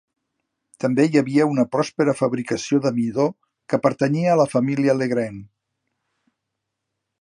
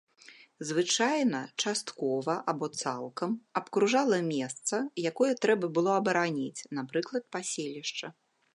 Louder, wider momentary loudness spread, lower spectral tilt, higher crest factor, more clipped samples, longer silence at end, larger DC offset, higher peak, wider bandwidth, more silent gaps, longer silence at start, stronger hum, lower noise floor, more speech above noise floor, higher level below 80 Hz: first, -20 LUFS vs -30 LUFS; about the same, 7 LU vs 9 LU; first, -6.5 dB/octave vs -3.5 dB/octave; about the same, 20 dB vs 18 dB; neither; first, 1.75 s vs 0.45 s; neither; first, -2 dBFS vs -12 dBFS; about the same, 11 kHz vs 11.5 kHz; neither; first, 0.8 s vs 0.3 s; neither; first, -80 dBFS vs -56 dBFS; first, 61 dB vs 26 dB; first, -66 dBFS vs -82 dBFS